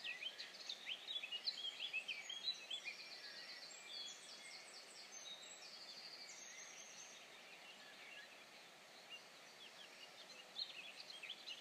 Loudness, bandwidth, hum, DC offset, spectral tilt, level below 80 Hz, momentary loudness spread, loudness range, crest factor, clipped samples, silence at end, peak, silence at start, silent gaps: -50 LUFS; 15.5 kHz; none; under 0.1%; 1 dB/octave; under -90 dBFS; 13 LU; 10 LU; 22 dB; under 0.1%; 0 s; -32 dBFS; 0 s; none